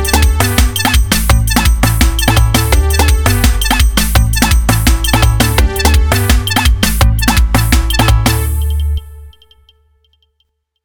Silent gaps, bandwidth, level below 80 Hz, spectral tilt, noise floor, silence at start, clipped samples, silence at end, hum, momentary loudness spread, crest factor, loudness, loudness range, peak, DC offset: none; over 20 kHz; -14 dBFS; -4 dB/octave; -64 dBFS; 0 s; under 0.1%; 1.55 s; none; 1 LU; 10 dB; -11 LUFS; 3 LU; 0 dBFS; 2%